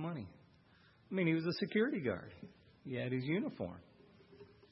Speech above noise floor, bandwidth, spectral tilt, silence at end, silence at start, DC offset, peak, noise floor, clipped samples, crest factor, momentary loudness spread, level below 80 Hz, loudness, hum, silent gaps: 29 dB; 5.8 kHz; -6 dB/octave; 0.2 s; 0 s; under 0.1%; -20 dBFS; -67 dBFS; under 0.1%; 18 dB; 20 LU; -76 dBFS; -38 LUFS; none; none